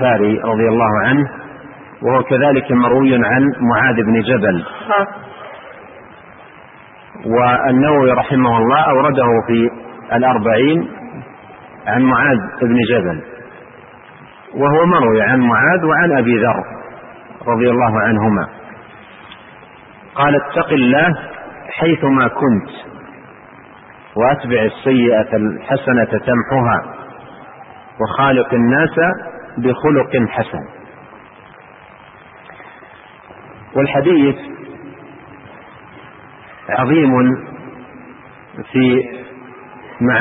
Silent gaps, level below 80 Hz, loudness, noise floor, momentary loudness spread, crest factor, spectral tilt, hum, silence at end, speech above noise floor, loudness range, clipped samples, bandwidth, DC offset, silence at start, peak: none; -50 dBFS; -14 LUFS; -40 dBFS; 21 LU; 14 dB; -12 dB/octave; none; 0 s; 27 dB; 6 LU; under 0.1%; 4 kHz; under 0.1%; 0 s; -2 dBFS